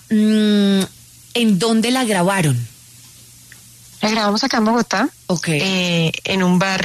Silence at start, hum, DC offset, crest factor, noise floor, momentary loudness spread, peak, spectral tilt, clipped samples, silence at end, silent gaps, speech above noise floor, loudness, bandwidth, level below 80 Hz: 0.1 s; none; under 0.1%; 12 dB; -43 dBFS; 7 LU; -4 dBFS; -5 dB/octave; under 0.1%; 0 s; none; 27 dB; -17 LUFS; 13.5 kHz; -54 dBFS